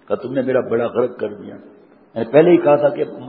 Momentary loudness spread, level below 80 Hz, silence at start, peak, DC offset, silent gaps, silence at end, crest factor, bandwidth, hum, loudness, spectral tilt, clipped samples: 17 LU; -62 dBFS; 0.1 s; 0 dBFS; under 0.1%; none; 0 s; 18 dB; 4.6 kHz; none; -17 LUFS; -12 dB/octave; under 0.1%